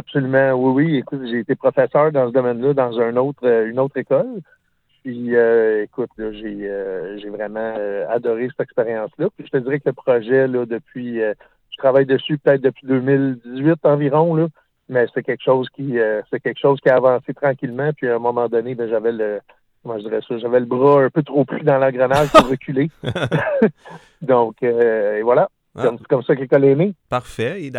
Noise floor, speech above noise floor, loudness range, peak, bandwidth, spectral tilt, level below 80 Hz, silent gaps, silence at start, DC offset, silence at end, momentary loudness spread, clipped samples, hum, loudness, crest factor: -63 dBFS; 45 dB; 5 LU; 0 dBFS; 13.5 kHz; -7.5 dB/octave; -52 dBFS; none; 0.1 s; under 0.1%; 0 s; 11 LU; under 0.1%; none; -18 LUFS; 18 dB